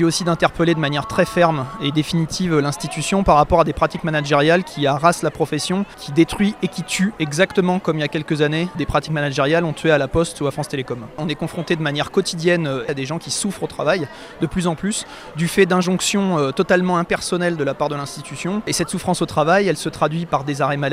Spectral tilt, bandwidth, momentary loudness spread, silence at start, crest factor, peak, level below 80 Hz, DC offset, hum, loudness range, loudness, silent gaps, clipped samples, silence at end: -5 dB/octave; 15.5 kHz; 8 LU; 0 s; 18 dB; 0 dBFS; -42 dBFS; under 0.1%; none; 4 LU; -19 LUFS; none; under 0.1%; 0 s